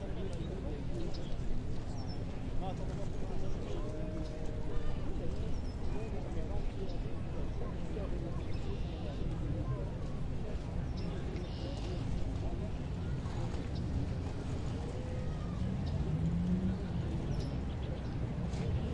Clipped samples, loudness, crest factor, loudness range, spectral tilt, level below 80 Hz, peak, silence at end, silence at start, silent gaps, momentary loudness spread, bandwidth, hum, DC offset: under 0.1%; -39 LUFS; 14 dB; 4 LU; -7.5 dB/octave; -40 dBFS; -20 dBFS; 0 s; 0 s; none; 5 LU; 9.4 kHz; none; under 0.1%